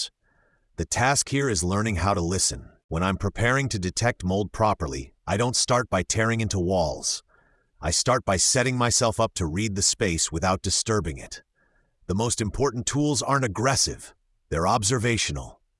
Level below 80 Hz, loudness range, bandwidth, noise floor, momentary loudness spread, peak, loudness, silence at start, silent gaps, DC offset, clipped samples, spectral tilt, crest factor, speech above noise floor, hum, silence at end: -44 dBFS; 3 LU; 12 kHz; -66 dBFS; 11 LU; -6 dBFS; -24 LUFS; 0 s; 2.84-2.89 s; under 0.1%; under 0.1%; -3.5 dB/octave; 20 dB; 42 dB; none; 0.3 s